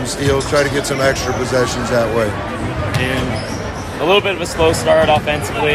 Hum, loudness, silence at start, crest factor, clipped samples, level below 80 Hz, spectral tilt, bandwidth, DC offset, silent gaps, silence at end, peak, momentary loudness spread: none; -16 LUFS; 0 s; 16 dB; under 0.1%; -34 dBFS; -4.5 dB/octave; 15.5 kHz; under 0.1%; none; 0 s; 0 dBFS; 9 LU